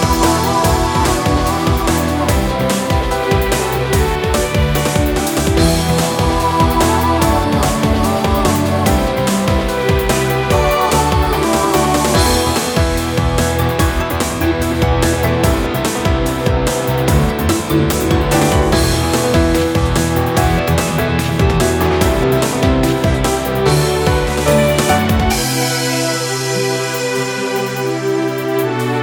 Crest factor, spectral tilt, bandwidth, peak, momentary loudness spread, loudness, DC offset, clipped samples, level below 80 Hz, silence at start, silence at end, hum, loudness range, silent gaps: 14 dB; -5 dB/octave; over 20 kHz; 0 dBFS; 3 LU; -15 LUFS; under 0.1%; under 0.1%; -22 dBFS; 0 s; 0 s; none; 2 LU; none